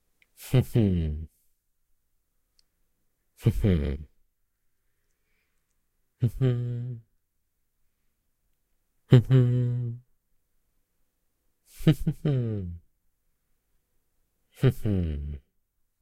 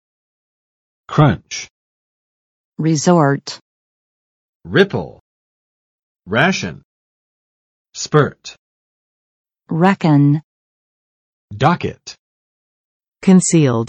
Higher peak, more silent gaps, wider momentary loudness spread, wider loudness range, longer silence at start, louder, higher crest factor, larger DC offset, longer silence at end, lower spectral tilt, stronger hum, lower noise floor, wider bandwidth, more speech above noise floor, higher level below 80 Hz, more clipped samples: about the same, -2 dBFS vs 0 dBFS; second, none vs 1.70-2.72 s, 3.61-4.60 s, 5.20-6.16 s, 6.85-7.85 s, 8.58-9.45 s, 10.44-11.48 s, 12.19-13.00 s, 13.08-13.12 s; second, 19 LU vs 22 LU; first, 7 LU vs 3 LU; second, 0.4 s vs 1.1 s; second, -26 LUFS vs -15 LUFS; first, 26 dB vs 18 dB; neither; first, 0.65 s vs 0 s; first, -8.5 dB/octave vs -5.5 dB/octave; neither; second, -75 dBFS vs under -90 dBFS; first, 14.5 kHz vs 8.8 kHz; second, 50 dB vs over 75 dB; first, -44 dBFS vs -50 dBFS; neither